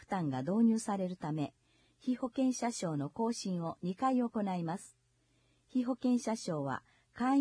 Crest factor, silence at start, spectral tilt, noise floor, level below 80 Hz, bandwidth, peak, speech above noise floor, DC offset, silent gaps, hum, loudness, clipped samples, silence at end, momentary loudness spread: 14 dB; 0.1 s; -6 dB/octave; -73 dBFS; -74 dBFS; 10.5 kHz; -20 dBFS; 39 dB; under 0.1%; none; none; -35 LUFS; under 0.1%; 0 s; 9 LU